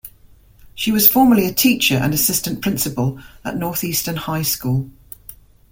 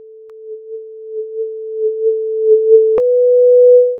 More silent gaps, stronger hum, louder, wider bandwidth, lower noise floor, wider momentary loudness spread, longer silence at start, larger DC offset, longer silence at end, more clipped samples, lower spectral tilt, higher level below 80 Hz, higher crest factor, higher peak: neither; neither; second, -17 LUFS vs -12 LUFS; first, 17 kHz vs 1.8 kHz; first, -48 dBFS vs -35 dBFS; second, 17 LU vs 22 LU; second, 0.05 s vs 0.3 s; neither; first, 0.4 s vs 0 s; neither; second, -4 dB/octave vs -8.5 dB/octave; first, -46 dBFS vs -60 dBFS; first, 18 dB vs 12 dB; about the same, 0 dBFS vs 0 dBFS